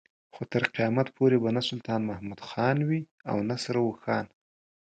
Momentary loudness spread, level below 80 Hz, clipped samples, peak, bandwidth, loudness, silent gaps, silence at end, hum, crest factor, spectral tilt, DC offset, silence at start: 10 LU; -64 dBFS; under 0.1%; -8 dBFS; 9.2 kHz; -28 LUFS; 3.11-3.18 s; 0.65 s; none; 20 dB; -6.5 dB/octave; under 0.1%; 0.35 s